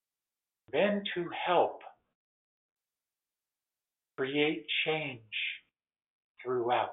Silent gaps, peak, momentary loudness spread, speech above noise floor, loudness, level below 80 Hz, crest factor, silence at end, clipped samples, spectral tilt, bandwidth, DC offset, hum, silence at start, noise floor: 2.15-2.76 s, 6.10-6.35 s; -14 dBFS; 12 LU; over 59 dB; -32 LUFS; -80 dBFS; 22 dB; 0 s; under 0.1%; -2 dB/octave; 4.1 kHz; under 0.1%; none; 0.7 s; under -90 dBFS